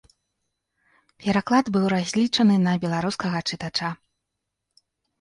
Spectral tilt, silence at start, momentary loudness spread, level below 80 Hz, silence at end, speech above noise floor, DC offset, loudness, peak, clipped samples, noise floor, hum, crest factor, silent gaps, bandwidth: -5.5 dB/octave; 1.2 s; 9 LU; -60 dBFS; 1.25 s; 60 dB; under 0.1%; -23 LUFS; -6 dBFS; under 0.1%; -82 dBFS; none; 18 dB; none; 11.5 kHz